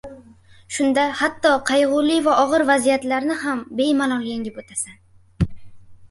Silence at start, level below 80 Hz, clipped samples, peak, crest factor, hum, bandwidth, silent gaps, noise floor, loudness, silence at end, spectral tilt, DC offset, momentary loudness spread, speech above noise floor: 0.05 s; -44 dBFS; under 0.1%; -2 dBFS; 18 dB; none; 11.5 kHz; none; -48 dBFS; -20 LUFS; 0.05 s; -4.5 dB/octave; under 0.1%; 11 LU; 29 dB